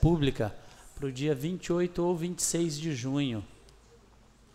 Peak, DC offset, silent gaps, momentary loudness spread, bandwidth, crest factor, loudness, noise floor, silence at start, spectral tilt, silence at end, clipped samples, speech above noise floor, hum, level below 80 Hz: -12 dBFS; under 0.1%; none; 11 LU; 16 kHz; 20 dB; -31 LUFS; -58 dBFS; 0 s; -5.5 dB/octave; 1.05 s; under 0.1%; 29 dB; none; -44 dBFS